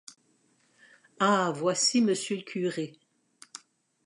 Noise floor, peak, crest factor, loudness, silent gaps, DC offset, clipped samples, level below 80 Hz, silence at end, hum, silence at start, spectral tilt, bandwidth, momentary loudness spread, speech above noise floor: -68 dBFS; -12 dBFS; 18 dB; -27 LUFS; none; under 0.1%; under 0.1%; -84 dBFS; 0.5 s; none; 1.2 s; -3.5 dB/octave; 11.5 kHz; 23 LU; 41 dB